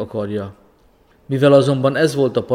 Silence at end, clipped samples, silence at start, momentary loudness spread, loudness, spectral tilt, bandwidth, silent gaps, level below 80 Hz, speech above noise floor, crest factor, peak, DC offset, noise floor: 0 s; under 0.1%; 0 s; 14 LU; -16 LUFS; -6.5 dB/octave; 14.5 kHz; none; -56 dBFS; 38 dB; 16 dB; 0 dBFS; under 0.1%; -54 dBFS